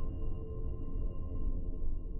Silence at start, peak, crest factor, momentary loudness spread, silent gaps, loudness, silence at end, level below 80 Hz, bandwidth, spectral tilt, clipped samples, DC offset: 0 s; -22 dBFS; 10 dB; 2 LU; none; -42 LUFS; 0 s; -36 dBFS; 3 kHz; -12 dB/octave; under 0.1%; under 0.1%